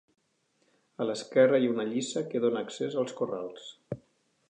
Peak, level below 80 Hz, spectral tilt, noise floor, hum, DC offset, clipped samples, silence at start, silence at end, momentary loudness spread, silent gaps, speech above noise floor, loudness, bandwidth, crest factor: -10 dBFS; -76 dBFS; -5 dB/octave; -73 dBFS; none; under 0.1%; under 0.1%; 1 s; 0.5 s; 19 LU; none; 44 dB; -29 LUFS; 9.6 kHz; 20 dB